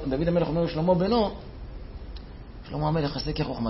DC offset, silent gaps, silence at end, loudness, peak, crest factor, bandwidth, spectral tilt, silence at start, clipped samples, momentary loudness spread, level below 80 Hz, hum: under 0.1%; none; 0 s; -26 LUFS; -12 dBFS; 16 dB; 5.8 kHz; -10 dB/octave; 0 s; under 0.1%; 19 LU; -40 dBFS; none